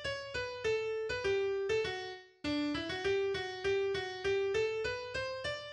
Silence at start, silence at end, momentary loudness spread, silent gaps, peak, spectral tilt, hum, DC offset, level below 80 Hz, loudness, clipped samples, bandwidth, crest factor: 0 s; 0 s; 5 LU; none; -22 dBFS; -4.5 dB/octave; none; under 0.1%; -60 dBFS; -35 LUFS; under 0.1%; 10 kHz; 12 dB